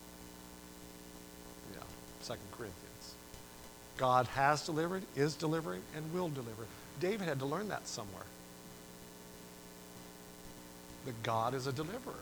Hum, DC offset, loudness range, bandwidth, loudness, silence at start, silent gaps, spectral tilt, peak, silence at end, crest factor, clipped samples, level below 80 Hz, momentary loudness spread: 60 Hz at -65 dBFS; under 0.1%; 14 LU; over 20 kHz; -38 LUFS; 0 s; none; -5 dB/octave; -16 dBFS; 0 s; 24 dB; under 0.1%; -64 dBFS; 20 LU